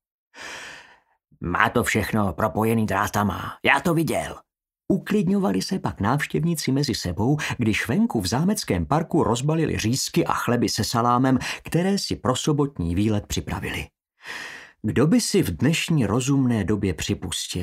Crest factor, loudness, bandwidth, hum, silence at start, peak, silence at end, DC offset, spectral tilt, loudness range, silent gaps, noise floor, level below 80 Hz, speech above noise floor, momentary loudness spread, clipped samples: 22 dB; -23 LUFS; 16 kHz; none; 0.35 s; 0 dBFS; 0 s; under 0.1%; -5 dB/octave; 2 LU; none; -58 dBFS; -46 dBFS; 36 dB; 11 LU; under 0.1%